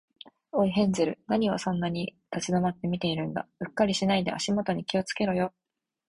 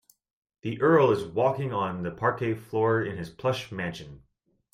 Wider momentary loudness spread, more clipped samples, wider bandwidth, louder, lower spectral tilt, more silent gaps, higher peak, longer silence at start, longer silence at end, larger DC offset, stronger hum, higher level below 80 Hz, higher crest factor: second, 9 LU vs 14 LU; neither; second, 11.5 kHz vs 15 kHz; about the same, -28 LUFS vs -27 LUFS; second, -5.5 dB/octave vs -7 dB/octave; neither; about the same, -10 dBFS vs -8 dBFS; second, 0.25 s vs 0.65 s; about the same, 0.6 s vs 0.55 s; neither; neither; about the same, -60 dBFS vs -62 dBFS; about the same, 18 dB vs 20 dB